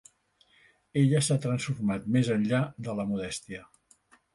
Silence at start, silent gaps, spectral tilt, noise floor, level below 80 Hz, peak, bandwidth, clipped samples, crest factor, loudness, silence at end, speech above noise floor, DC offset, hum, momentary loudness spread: 0.95 s; none; -6 dB/octave; -66 dBFS; -62 dBFS; -12 dBFS; 11.5 kHz; under 0.1%; 16 dB; -28 LUFS; 0.7 s; 38 dB; under 0.1%; none; 12 LU